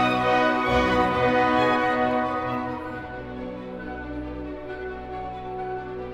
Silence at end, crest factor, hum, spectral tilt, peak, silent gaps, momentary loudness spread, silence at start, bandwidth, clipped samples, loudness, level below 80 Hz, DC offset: 0 s; 16 dB; none; -6 dB/octave; -8 dBFS; none; 14 LU; 0 s; 14.5 kHz; under 0.1%; -25 LUFS; -44 dBFS; under 0.1%